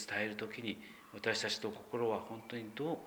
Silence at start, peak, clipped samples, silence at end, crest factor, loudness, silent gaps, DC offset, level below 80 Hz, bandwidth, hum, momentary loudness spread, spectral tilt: 0 s; -20 dBFS; under 0.1%; 0 s; 20 dB; -39 LUFS; none; under 0.1%; -78 dBFS; over 20 kHz; none; 9 LU; -3.5 dB/octave